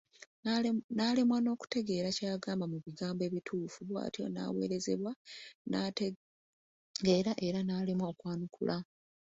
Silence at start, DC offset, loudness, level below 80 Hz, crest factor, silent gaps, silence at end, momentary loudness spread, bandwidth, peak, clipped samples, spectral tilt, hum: 0.45 s; under 0.1%; -35 LUFS; -72 dBFS; 20 dB; 0.84-0.89 s, 5.16-5.25 s, 5.55-5.65 s, 6.16-6.94 s; 0.55 s; 10 LU; 8 kHz; -16 dBFS; under 0.1%; -5.5 dB/octave; none